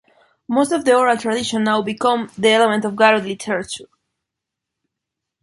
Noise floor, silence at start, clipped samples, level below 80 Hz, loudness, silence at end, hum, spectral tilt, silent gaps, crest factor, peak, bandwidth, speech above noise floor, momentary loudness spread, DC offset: -82 dBFS; 0.5 s; under 0.1%; -62 dBFS; -17 LUFS; 1.6 s; none; -4 dB/octave; none; 18 dB; -2 dBFS; 11.5 kHz; 65 dB; 9 LU; under 0.1%